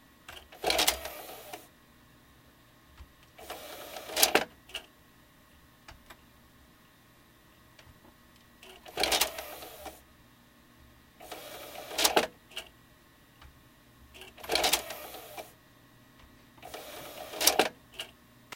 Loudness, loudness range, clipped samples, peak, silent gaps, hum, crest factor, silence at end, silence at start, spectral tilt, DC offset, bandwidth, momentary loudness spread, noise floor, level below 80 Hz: -30 LUFS; 2 LU; under 0.1%; -4 dBFS; none; none; 34 dB; 0 s; 0.3 s; -0.5 dB/octave; under 0.1%; 17 kHz; 26 LU; -60 dBFS; -60 dBFS